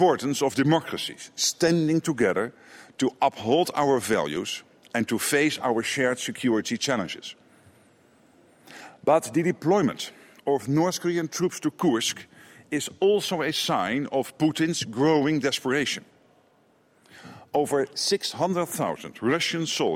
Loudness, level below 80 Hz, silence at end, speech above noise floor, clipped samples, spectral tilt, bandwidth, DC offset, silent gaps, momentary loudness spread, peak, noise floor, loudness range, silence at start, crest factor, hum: -25 LUFS; -68 dBFS; 0 s; 37 dB; under 0.1%; -4 dB/octave; 16.5 kHz; under 0.1%; none; 9 LU; -8 dBFS; -62 dBFS; 4 LU; 0 s; 18 dB; none